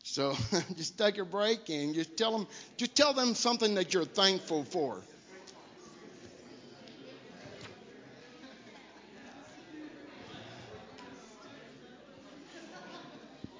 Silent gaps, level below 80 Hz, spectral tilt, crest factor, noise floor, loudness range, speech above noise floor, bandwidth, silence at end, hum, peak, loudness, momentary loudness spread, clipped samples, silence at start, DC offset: none; -68 dBFS; -3 dB/octave; 26 dB; -54 dBFS; 21 LU; 22 dB; 7.8 kHz; 0 s; none; -10 dBFS; -31 LUFS; 25 LU; under 0.1%; 0.05 s; under 0.1%